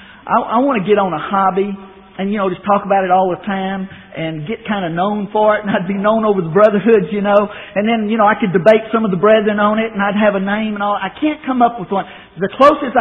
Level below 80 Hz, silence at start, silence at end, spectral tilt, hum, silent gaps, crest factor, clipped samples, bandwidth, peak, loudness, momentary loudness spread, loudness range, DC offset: -52 dBFS; 0 s; 0 s; -5 dB/octave; none; none; 14 dB; under 0.1%; 4.2 kHz; 0 dBFS; -15 LUFS; 11 LU; 4 LU; under 0.1%